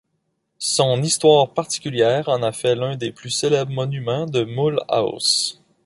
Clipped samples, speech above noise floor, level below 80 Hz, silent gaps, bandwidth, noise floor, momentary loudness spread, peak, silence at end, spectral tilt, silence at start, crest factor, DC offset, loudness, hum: under 0.1%; 52 dB; -62 dBFS; none; 11.5 kHz; -72 dBFS; 9 LU; -2 dBFS; 0.3 s; -4 dB/octave; 0.6 s; 18 dB; under 0.1%; -20 LUFS; none